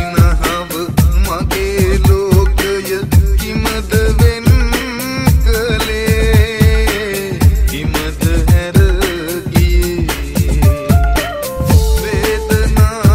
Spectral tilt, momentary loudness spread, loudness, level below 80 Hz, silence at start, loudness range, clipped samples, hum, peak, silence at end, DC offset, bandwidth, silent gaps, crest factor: -5.5 dB/octave; 6 LU; -13 LUFS; -16 dBFS; 0 s; 1 LU; under 0.1%; none; 0 dBFS; 0 s; under 0.1%; 16.5 kHz; none; 12 dB